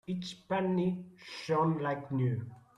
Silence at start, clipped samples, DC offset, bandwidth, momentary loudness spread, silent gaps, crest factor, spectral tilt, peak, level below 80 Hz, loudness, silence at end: 0.1 s; under 0.1%; under 0.1%; 11 kHz; 11 LU; none; 14 dB; -7.5 dB/octave; -18 dBFS; -70 dBFS; -33 LUFS; 0.2 s